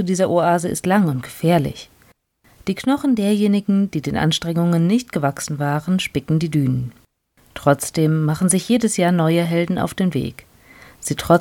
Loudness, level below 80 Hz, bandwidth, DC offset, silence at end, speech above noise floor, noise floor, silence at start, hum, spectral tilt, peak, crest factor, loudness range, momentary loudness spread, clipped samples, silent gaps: -19 LUFS; -50 dBFS; 17 kHz; under 0.1%; 0 s; 39 dB; -57 dBFS; 0 s; none; -5.5 dB/octave; -2 dBFS; 18 dB; 2 LU; 9 LU; under 0.1%; none